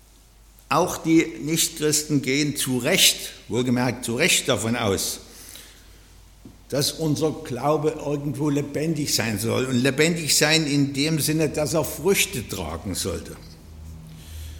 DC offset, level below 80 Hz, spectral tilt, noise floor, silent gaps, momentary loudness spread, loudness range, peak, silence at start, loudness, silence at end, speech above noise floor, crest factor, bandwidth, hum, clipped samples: under 0.1%; -48 dBFS; -3.5 dB/octave; -51 dBFS; none; 16 LU; 6 LU; -4 dBFS; 0.7 s; -22 LUFS; 0 s; 29 dB; 20 dB; 17.5 kHz; none; under 0.1%